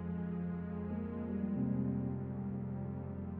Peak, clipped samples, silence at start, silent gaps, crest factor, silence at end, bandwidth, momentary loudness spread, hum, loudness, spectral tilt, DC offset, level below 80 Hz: -26 dBFS; under 0.1%; 0 s; none; 14 dB; 0 s; 3.3 kHz; 6 LU; none; -39 LUFS; -11 dB/octave; under 0.1%; -58 dBFS